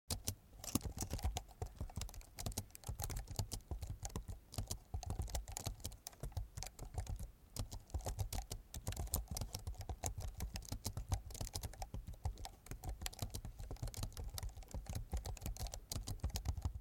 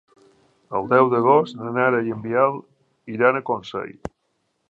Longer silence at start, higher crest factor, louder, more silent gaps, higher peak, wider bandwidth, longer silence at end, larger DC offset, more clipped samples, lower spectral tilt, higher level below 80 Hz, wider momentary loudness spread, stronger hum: second, 0.1 s vs 0.7 s; first, 28 dB vs 20 dB; second, -47 LUFS vs -20 LUFS; neither; second, -16 dBFS vs -2 dBFS; first, 17 kHz vs 7.8 kHz; second, 0 s vs 0.6 s; neither; neither; second, -4 dB/octave vs -8 dB/octave; first, -48 dBFS vs -58 dBFS; second, 7 LU vs 18 LU; neither